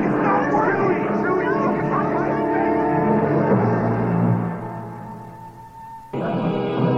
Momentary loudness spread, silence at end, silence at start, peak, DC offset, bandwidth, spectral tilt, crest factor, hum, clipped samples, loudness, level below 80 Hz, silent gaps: 18 LU; 0 s; 0 s; -4 dBFS; under 0.1%; 6.8 kHz; -9.5 dB/octave; 16 dB; none; under 0.1%; -20 LUFS; -50 dBFS; none